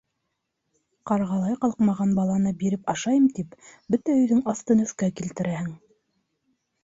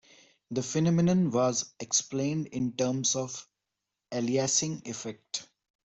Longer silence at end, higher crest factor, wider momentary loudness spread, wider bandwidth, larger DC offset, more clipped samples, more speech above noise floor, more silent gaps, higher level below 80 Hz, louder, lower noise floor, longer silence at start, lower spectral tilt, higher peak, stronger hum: first, 1.05 s vs 0.4 s; about the same, 16 dB vs 18 dB; second, 9 LU vs 12 LU; about the same, 8 kHz vs 8.2 kHz; neither; neither; about the same, 55 dB vs 58 dB; neither; first, -60 dBFS vs -66 dBFS; first, -24 LUFS vs -29 LUFS; second, -79 dBFS vs -86 dBFS; first, 1.05 s vs 0.5 s; first, -6.5 dB/octave vs -4.5 dB/octave; about the same, -10 dBFS vs -12 dBFS; neither